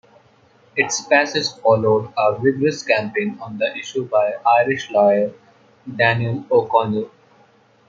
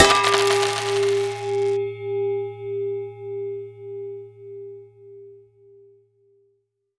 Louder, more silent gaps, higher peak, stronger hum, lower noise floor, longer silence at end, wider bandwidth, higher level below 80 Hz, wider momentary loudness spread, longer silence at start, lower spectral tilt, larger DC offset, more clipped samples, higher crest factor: first, -18 LUFS vs -23 LUFS; neither; about the same, -2 dBFS vs 0 dBFS; neither; second, -54 dBFS vs -70 dBFS; second, 0.8 s vs 1.6 s; second, 7.8 kHz vs 11 kHz; second, -64 dBFS vs -54 dBFS; second, 9 LU vs 22 LU; first, 0.75 s vs 0 s; first, -4.5 dB/octave vs -3 dB/octave; neither; neither; second, 18 dB vs 24 dB